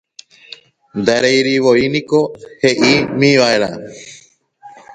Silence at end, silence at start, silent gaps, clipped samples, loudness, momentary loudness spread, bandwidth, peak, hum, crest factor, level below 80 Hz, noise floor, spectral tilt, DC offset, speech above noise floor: 0 s; 0.95 s; none; under 0.1%; -13 LUFS; 15 LU; 9.4 kHz; 0 dBFS; none; 16 dB; -54 dBFS; -47 dBFS; -4.5 dB/octave; under 0.1%; 33 dB